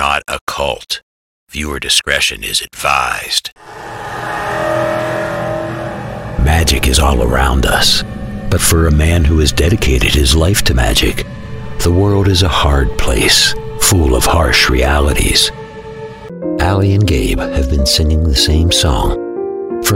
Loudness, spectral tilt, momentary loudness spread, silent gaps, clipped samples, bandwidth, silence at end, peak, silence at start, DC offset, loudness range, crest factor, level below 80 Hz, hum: -13 LUFS; -4 dB/octave; 13 LU; 0.41-0.47 s, 1.03-1.47 s, 3.52-3.56 s; under 0.1%; 16.5 kHz; 0 s; 0 dBFS; 0 s; under 0.1%; 5 LU; 12 dB; -18 dBFS; none